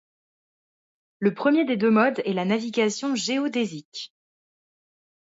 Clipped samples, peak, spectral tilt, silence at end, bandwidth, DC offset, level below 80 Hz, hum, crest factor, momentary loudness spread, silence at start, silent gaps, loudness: under 0.1%; -8 dBFS; -5 dB/octave; 1.2 s; 8 kHz; under 0.1%; -76 dBFS; none; 18 dB; 15 LU; 1.2 s; 3.85-3.92 s; -23 LUFS